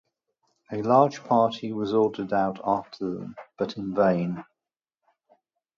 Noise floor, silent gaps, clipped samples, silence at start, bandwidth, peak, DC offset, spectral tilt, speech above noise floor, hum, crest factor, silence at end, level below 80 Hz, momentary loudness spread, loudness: -90 dBFS; none; under 0.1%; 0.7 s; 7.4 kHz; -4 dBFS; under 0.1%; -7.5 dB/octave; 65 dB; none; 22 dB; 1.35 s; -66 dBFS; 13 LU; -25 LUFS